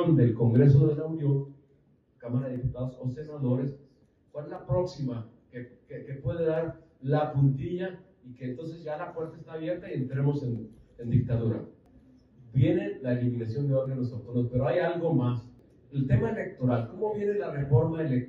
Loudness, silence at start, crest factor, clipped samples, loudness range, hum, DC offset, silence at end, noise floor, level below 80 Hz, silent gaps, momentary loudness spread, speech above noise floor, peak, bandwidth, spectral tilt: -29 LUFS; 0 s; 18 dB; under 0.1%; 6 LU; none; under 0.1%; 0 s; -64 dBFS; -52 dBFS; none; 15 LU; 37 dB; -10 dBFS; 5.6 kHz; -10.5 dB/octave